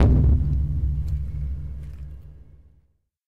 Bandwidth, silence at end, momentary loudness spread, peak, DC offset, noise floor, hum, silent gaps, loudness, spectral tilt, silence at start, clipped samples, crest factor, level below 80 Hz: 2.7 kHz; 0 s; 21 LU; -8 dBFS; under 0.1%; -64 dBFS; none; none; -24 LUFS; -10 dB/octave; 0 s; under 0.1%; 16 dB; -26 dBFS